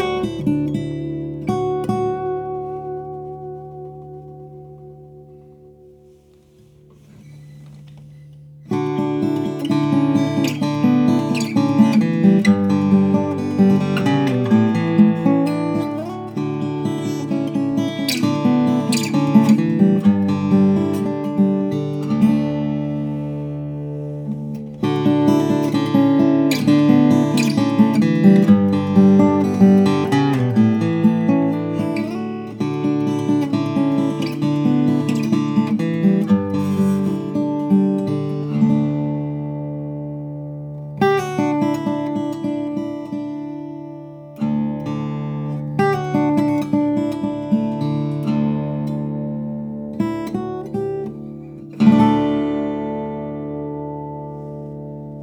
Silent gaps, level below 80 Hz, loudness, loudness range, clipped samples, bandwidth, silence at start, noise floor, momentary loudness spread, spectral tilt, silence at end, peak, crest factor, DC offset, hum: none; -54 dBFS; -18 LUFS; 10 LU; under 0.1%; 16.5 kHz; 0 s; -50 dBFS; 14 LU; -7.5 dB/octave; 0 s; 0 dBFS; 18 dB; under 0.1%; none